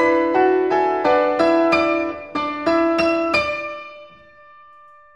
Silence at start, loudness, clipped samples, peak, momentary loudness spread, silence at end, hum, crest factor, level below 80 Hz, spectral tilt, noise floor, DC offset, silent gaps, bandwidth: 0 s; -18 LUFS; under 0.1%; -2 dBFS; 9 LU; 1.1 s; none; 16 dB; -52 dBFS; -5.5 dB/octave; -47 dBFS; 0.1%; none; 9.2 kHz